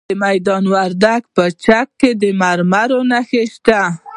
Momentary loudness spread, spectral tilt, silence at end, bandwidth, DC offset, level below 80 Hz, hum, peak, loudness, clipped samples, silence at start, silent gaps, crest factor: 2 LU; -6 dB/octave; 0 s; 11 kHz; under 0.1%; -50 dBFS; none; 0 dBFS; -14 LUFS; under 0.1%; 0.1 s; none; 14 dB